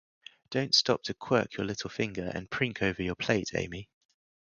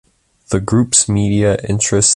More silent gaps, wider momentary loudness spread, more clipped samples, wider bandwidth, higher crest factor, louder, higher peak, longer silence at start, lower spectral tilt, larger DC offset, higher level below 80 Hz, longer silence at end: neither; first, 11 LU vs 7 LU; neither; about the same, 11 kHz vs 11.5 kHz; first, 22 dB vs 14 dB; second, -30 LUFS vs -14 LUFS; second, -10 dBFS vs 0 dBFS; about the same, 0.5 s vs 0.5 s; about the same, -4 dB/octave vs -4 dB/octave; neither; second, -56 dBFS vs -36 dBFS; first, 0.7 s vs 0 s